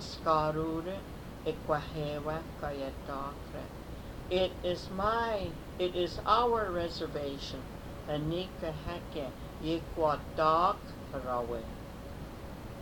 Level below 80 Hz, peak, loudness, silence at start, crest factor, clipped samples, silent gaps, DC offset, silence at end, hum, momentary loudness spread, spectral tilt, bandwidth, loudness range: -48 dBFS; -12 dBFS; -34 LUFS; 0 s; 22 dB; under 0.1%; none; under 0.1%; 0 s; none; 16 LU; -6 dB/octave; 19 kHz; 5 LU